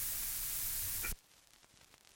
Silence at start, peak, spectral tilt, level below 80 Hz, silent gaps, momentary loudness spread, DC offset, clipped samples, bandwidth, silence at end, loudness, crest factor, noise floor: 0 s; -24 dBFS; 0 dB/octave; -54 dBFS; none; 6 LU; under 0.1%; under 0.1%; 17 kHz; 1 s; -37 LUFS; 18 dB; -65 dBFS